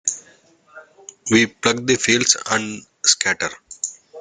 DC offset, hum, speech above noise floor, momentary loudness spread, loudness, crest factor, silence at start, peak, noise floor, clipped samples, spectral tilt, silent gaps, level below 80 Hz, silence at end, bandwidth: under 0.1%; none; 34 dB; 13 LU; -18 LUFS; 22 dB; 0.05 s; 0 dBFS; -53 dBFS; under 0.1%; -2 dB/octave; none; -58 dBFS; 0 s; 10 kHz